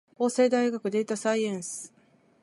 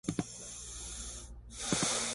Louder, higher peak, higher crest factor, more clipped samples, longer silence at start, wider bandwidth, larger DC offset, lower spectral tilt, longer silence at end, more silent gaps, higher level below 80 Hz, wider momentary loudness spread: first, -27 LUFS vs -37 LUFS; first, -12 dBFS vs -16 dBFS; second, 16 dB vs 22 dB; neither; first, 0.2 s vs 0.05 s; about the same, 11.5 kHz vs 12 kHz; neither; first, -4.5 dB/octave vs -2.5 dB/octave; first, 0.55 s vs 0 s; neither; second, -82 dBFS vs -52 dBFS; about the same, 14 LU vs 14 LU